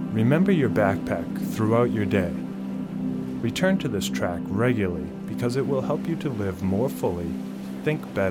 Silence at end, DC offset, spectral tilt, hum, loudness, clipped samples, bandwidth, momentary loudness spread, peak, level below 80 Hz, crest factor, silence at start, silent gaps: 0 s; under 0.1%; -7 dB/octave; none; -25 LUFS; under 0.1%; 17.5 kHz; 10 LU; -8 dBFS; -52 dBFS; 18 dB; 0 s; none